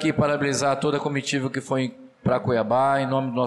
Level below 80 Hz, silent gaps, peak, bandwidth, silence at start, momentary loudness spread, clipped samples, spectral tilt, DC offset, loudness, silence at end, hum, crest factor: -58 dBFS; none; -12 dBFS; 12 kHz; 0 s; 6 LU; under 0.1%; -5.5 dB/octave; under 0.1%; -23 LUFS; 0 s; none; 12 dB